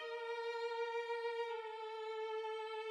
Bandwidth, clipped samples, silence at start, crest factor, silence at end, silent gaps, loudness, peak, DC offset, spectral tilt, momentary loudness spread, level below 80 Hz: 10 kHz; under 0.1%; 0 s; 12 dB; 0 s; none; -43 LUFS; -30 dBFS; under 0.1%; 0.5 dB/octave; 4 LU; under -90 dBFS